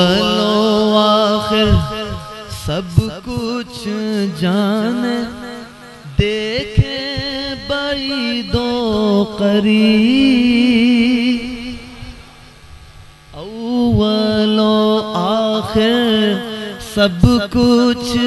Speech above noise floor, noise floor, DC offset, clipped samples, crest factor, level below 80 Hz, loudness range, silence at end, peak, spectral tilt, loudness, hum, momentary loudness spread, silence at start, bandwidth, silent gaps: 26 dB; -40 dBFS; under 0.1%; under 0.1%; 16 dB; -32 dBFS; 6 LU; 0 s; 0 dBFS; -6 dB/octave; -15 LUFS; none; 14 LU; 0 s; 12 kHz; none